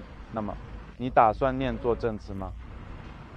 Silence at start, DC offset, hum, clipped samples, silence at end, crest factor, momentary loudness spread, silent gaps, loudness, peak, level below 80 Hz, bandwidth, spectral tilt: 0 s; under 0.1%; none; under 0.1%; 0 s; 22 dB; 21 LU; none; -28 LUFS; -6 dBFS; -42 dBFS; 8.4 kHz; -8 dB/octave